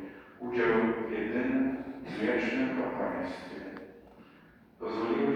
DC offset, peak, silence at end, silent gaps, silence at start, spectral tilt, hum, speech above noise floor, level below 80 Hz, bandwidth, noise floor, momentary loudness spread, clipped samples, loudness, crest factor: under 0.1%; -14 dBFS; 0 s; none; 0 s; -7 dB/octave; none; 27 dB; -62 dBFS; 8.6 kHz; -58 dBFS; 15 LU; under 0.1%; -32 LUFS; 18 dB